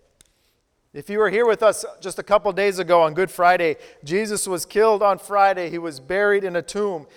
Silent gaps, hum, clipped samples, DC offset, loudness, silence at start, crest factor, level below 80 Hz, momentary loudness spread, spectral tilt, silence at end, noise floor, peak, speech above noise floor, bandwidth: none; none; under 0.1%; under 0.1%; -20 LUFS; 0.95 s; 18 dB; -58 dBFS; 11 LU; -4 dB/octave; 0.1 s; -67 dBFS; -4 dBFS; 47 dB; 17.5 kHz